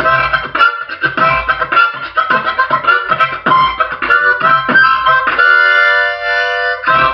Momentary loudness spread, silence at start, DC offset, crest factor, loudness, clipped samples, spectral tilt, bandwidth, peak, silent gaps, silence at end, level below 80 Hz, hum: 6 LU; 0 s; under 0.1%; 12 dB; -11 LUFS; under 0.1%; -5 dB/octave; 6.2 kHz; 0 dBFS; none; 0 s; -42 dBFS; none